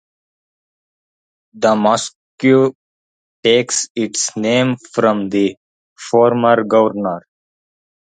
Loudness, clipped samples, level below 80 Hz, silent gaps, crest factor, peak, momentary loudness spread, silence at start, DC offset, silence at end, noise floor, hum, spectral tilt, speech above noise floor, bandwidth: -15 LUFS; under 0.1%; -62 dBFS; 2.15-2.38 s, 2.75-3.43 s, 3.90-3.95 s, 5.57-5.96 s; 18 dB; 0 dBFS; 8 LU; 1.55 s; under 0.1%; 1 s; under -90 dBFS; none; -4 dB/octave; over 75 dB; 9.6 kHz